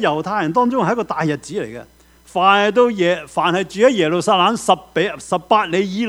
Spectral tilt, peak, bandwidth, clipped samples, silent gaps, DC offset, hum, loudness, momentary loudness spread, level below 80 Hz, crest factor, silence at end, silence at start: -5 dB/octave; 0 dBFS; 14 kHz; under 0.1%; none; under 0.1%; none; -17 LUFS; 10 LU; -54 dBFS; 18 dB; 0 s; 0 s